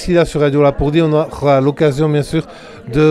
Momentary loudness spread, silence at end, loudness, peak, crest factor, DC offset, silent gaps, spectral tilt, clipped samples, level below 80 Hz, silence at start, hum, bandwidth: 8 LU; 0 s; -14 LUFS; 0 dBFS; 12 dB; under 0.1%; none; -7.5 dB/octave; under 0.1%; -34 dBFS; 0 s; none; 12.5 kHz